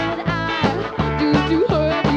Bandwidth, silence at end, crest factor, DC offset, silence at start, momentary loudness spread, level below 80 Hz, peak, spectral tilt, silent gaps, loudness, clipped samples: 8.4 kHz; 0 s; 14 dB; under 0.1%; 0 s; 5 LU; -34 dBFS; -4 dBFS; -7 dB/octave; none; -19 LUFS; under 0.1%